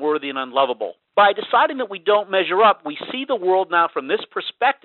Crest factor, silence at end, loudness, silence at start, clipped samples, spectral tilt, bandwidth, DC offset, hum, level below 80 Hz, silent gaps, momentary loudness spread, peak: 16 dB; 0.1 s; -19 LUFS; 0 s; under 0.1%; 0 dB/octave; 4.3 kHz; under 0.1%; none; -68 dBFS; none; 9 LU; -2 dBFS